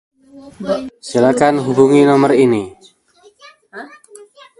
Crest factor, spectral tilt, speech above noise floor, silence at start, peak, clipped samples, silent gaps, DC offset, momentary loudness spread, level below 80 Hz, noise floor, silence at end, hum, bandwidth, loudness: 16 dB; -6.5 dB/octave; 37 dB; 0.35 s; 0 dBFS; under 0.1%; none; under 0.1%; 24 LU; -56 dBFS; -50 dBFS; 0.75 s; none; 11.5 kHz; -13 LUFS